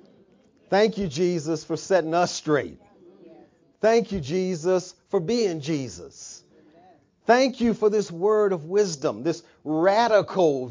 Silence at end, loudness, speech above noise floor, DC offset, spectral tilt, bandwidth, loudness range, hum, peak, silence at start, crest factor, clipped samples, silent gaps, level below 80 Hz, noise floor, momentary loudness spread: 0 s; -23 LUFS; 35 dB; under 0.1%; -5 dB/octave; 7.6 kHz; 4 LU; none; -6 dBFS; 0.7 s; 18 dB; under 0.1%; none; -58 dBFS; -58 dBFS; 10 LU